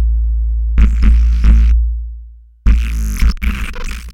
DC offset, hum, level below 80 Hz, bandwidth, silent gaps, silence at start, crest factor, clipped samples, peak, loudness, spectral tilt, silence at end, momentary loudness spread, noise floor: under 0.1%; none; -12 dBFS; 11.5 kHz; none; 0 s; 12 dB; under 0.1%; 0 dBFS; -15 LUFS; -6.5 dB/octave; 0 s; 13 LU; -35 dBFS